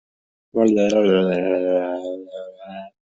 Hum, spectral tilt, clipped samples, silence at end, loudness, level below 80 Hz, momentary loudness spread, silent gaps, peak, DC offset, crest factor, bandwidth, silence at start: none; -6.5 dB/octave; under 0.1%; 0.3 s; -19 LUFS; -62 dBFS; 19 LU; none; -4 dBFS; under 0.1%; 16 dB; 7.8 kHz; 0.55 s